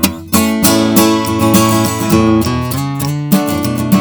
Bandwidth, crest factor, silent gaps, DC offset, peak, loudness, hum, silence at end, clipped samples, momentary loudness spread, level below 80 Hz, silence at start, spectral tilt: over 20 kHz; 12 dB; none; under 0.1%; 0 dBFS; -12 LUFS; none; 0 s; under 0.1%; 7 LU; -36 dBFS; 0 s; -5 dB/octave